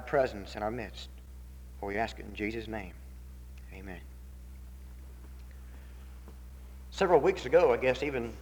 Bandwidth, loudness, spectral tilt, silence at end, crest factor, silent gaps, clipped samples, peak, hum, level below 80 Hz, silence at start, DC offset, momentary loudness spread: over 20 kHz; -30 LUFS; -6 dB/octave; 0 s; 22 dB; none; under 0.1%; -10 dBFS; none; -46 dBFS; 0 s; under 0.1%; 24 LU